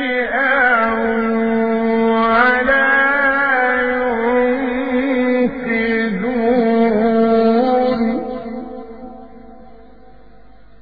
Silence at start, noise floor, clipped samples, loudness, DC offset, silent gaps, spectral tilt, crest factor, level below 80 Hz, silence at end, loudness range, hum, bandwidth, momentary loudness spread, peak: 0 s; -46 dBFS; under 0.1%; -15 LUFS; 1%; none; -8.5 dB/octave; 16 dB; -46 dBFS; 1.2 s; 4 LU; none; 5 kHz; 11 LU; -2 dBFS